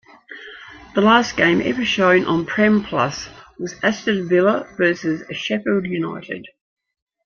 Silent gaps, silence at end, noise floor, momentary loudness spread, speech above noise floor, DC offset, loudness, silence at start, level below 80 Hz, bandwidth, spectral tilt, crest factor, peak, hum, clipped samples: none; 0.75 s; -40 dBFS; 20 LU; 21 dB; under 0.1%; -18 LUFS; 0.3 s; -54 dBFS; 7 kHz; -5.5 dB/octave; 18 dB; -2 dBFS; none; under 0.1%